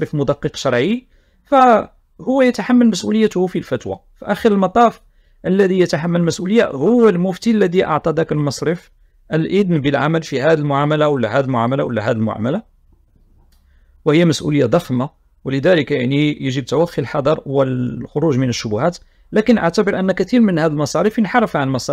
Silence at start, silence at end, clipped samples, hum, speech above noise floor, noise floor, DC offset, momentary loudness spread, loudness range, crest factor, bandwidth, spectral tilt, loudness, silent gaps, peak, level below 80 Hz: 0 s; 0 s; under 0.1%; none; 37 dB; -52 dBFS; under 0.1%; 8 LU; 3 LU; 16 dB; 14 kHz; -6.5 dB/octave; -16 LUFS; none; 0 dBFS; -48 dBFS